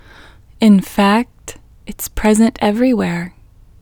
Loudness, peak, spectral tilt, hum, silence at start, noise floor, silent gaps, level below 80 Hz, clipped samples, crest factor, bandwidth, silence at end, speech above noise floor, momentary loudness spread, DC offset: -14 LUFS; 0 dBFS; -5.5 dB/octave; none; 0.6 s; -42 dBFS; none; -36 dBFS; under 0.1%; 16 dB; 20 kHz; 0.5 s; 28 dB; 20 LU; under 0.1%